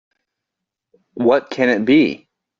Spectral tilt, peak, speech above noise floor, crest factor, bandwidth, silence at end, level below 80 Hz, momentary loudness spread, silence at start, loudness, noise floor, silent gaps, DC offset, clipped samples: -4 dB/octave; -2 dBFS; 66 dB; 18 dB; 7.2 kHz; 0.45 s; -60 dBFS; 7 LU; 1.15 s; -16 LUFS; -82 dBFS; none; under 0.1%; under 0.1%